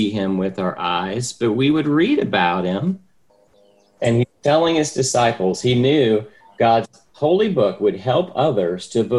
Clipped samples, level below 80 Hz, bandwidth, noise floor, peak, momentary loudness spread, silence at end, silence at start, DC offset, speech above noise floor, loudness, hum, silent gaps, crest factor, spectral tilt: under 0.1%; -54 dBFS; 12 kHz; -57 dBFS; -4 dBFS; 7 LU; 0 s; 0 s; 0.1%; 39 dB; -19 LUFS; none; none; 16 dB; -5.5 dB/octave